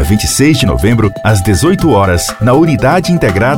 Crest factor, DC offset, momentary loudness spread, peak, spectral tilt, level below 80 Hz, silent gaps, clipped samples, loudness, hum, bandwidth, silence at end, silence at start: 10 dB; 1%; 3 LU; 0 dBFS; -5.5 dB/octave; -24 dBFS; none; under 0.1%; -10 LUFS; none; 17.5 kHz; 0 s; 0 s